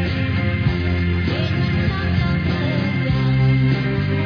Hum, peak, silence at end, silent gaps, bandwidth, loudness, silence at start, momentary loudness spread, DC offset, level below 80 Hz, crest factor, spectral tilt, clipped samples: none; -6 dBFS; 0 s; none; 5.4 kHz; -19 LUFS; 0 s; 4 LU; under 0.1%; -32 dBFS; 12 dB; -8.5 dB/octave; under 0.1%